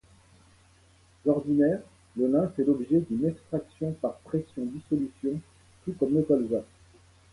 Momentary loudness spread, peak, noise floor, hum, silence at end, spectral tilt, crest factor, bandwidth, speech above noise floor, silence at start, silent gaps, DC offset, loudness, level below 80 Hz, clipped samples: 11 LU; -12 dBFS; -60 dBFS; none; 0.7 s; -9.5 dB/octave; 18 dB; 11.5 kHz; 33 dB; 1.25 s; none; under 0.1%; -28 LUFS; -60 dBFS; under 0.1%